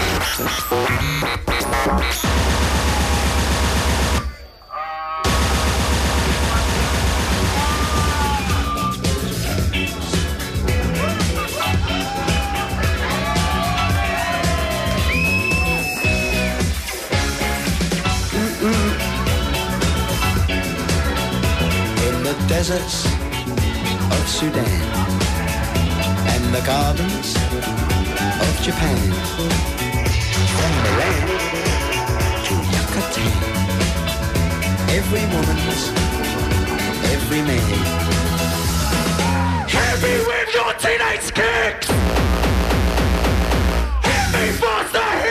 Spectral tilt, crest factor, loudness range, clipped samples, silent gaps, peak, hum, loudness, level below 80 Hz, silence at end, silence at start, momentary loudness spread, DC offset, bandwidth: -4.5 dB/octave; 12 dB; 2 LU; under 0.1%; none; -8 dBFS; none; -19 LUFS; -26 dBFS; 0 s; 0 s; 3 LU; under 0.1%; 15.5 kHz